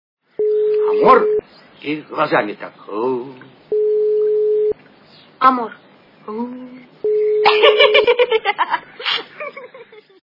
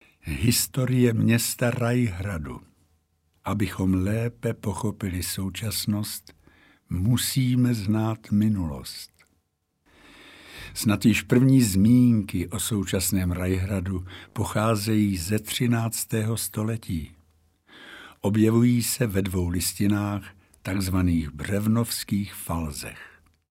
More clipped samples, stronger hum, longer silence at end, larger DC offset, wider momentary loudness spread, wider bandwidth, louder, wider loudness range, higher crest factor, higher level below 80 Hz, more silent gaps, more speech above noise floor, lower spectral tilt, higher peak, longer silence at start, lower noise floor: neither; neither; about the same, 0.45 s vs 0.45 s; neither; first, 19 LU vs 14 LU; second, 5.8 kHz vs 16 kHz; first, -16 LUFS vs -24 LUFS; about the same, 5 LU vs 6 LU; about the same, 18 dB vs 18 dB; second, -62 dBFS vs -46 dBFS; neither; second, 30 dB vs 49 dB; about the same, -5.5 dB/octave vs -5.5 dB/octave; first, 0 dBFS vs -6 dBFS; first, 0.4 s vs 0.25 s; second, -47 dBFS vs -73 dBFS